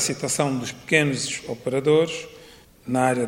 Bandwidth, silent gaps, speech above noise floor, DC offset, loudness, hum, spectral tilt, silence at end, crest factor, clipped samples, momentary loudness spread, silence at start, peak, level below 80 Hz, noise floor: 16.5 kHz; none; 26 dB; under 0.1%; -23 LUFS; none; -4 dB/octave; 0 s; 22 dB; under 0.1%; 11 LU; 0 s; -2 dBFS; -58 dBFS; -48 dBFS